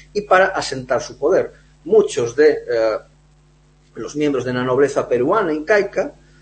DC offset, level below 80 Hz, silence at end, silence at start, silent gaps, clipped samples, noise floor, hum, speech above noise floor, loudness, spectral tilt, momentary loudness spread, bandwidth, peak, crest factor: under 0.1%; -50 dBFS; 0.3 s; 0.15 s; none; under 0.1%; -52 dBFS; none; 35 dB; -18 LUFS; -5 dB/octave; 12 LU; 8.8 kHz; -2 dBFS; 16 dB